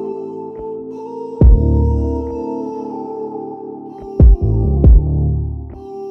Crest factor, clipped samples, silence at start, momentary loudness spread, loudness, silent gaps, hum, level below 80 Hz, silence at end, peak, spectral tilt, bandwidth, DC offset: 14 dB; under 0.1%; 0 s; 17 LU; -16 LUFS; none; none; -16 dBFS; 0 s; 0 dBFS; -12.5 dB/octave; 1.4 kHz; under 0.1%